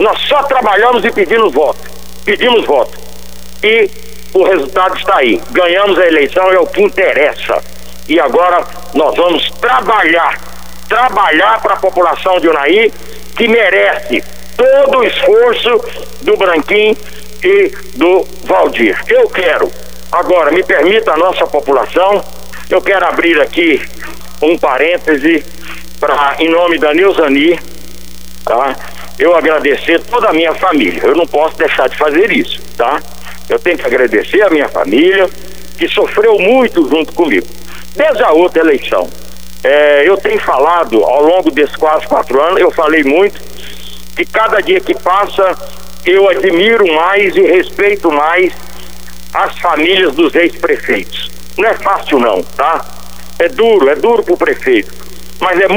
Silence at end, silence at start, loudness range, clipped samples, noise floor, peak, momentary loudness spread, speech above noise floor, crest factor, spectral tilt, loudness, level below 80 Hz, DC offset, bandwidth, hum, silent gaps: 0 s; 0 s; 2 LU; under 0.1%; -32 dBFS; 0 dBFS; 10 LU; 22 dB; 10 dB; -4 dB/octave; -10 LUFS; -38 dBFS; 5%; over 20 kHz; none; none